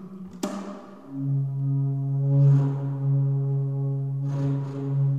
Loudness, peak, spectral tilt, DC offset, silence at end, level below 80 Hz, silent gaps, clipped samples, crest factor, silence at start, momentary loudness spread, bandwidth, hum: -25 LUFS; -12 dBFS; -9.5 dB/octave; 0.2%; 0 s; -66 dBFS; none; under 0.1%; 14 dB; 0 s; 15 LU; 7.8 kHz; none